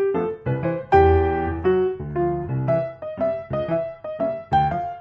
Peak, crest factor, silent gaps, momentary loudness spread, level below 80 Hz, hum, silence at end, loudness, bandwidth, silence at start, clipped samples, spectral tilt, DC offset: -4 dBFS; 18 dB; none; 9 LU; -36 dBFS; none; 0 s; -22 LUFS; 5.6 kHz; 0 s; under 0.1%; -9.5 dB/octave; under 0.1%